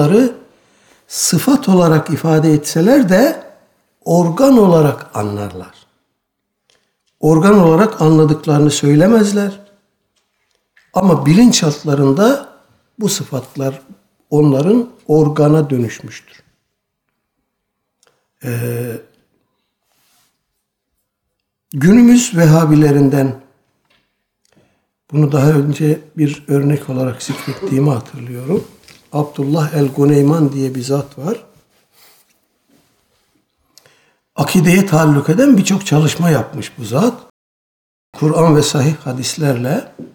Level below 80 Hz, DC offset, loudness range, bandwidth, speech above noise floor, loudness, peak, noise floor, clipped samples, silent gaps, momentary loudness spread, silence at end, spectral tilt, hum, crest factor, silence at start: -50 dBFS; under 0.1%; 14 LU; 19.5 kHz; 61 dB; -13 LUFS; 0 dBFS; -73 dBFS; under 0.1%; 37.30-38.13 s; 14 LU; 0.1 s; -6 dB/octave; none; 14 dB; 0 s